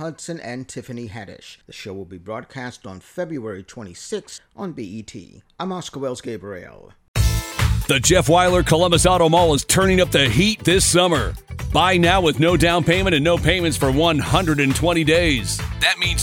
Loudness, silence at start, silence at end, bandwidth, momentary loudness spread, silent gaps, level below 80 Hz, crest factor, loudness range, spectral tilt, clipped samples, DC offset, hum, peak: -17 LUFS; 0 s; 0 s; 18.5 kHz; 19 LU; 7.08-7.14 s; -32 dBFS; 18 dB; 16 LU; -4 dB/octave; under 0.1%; under 0.1%; none; -2 dBFS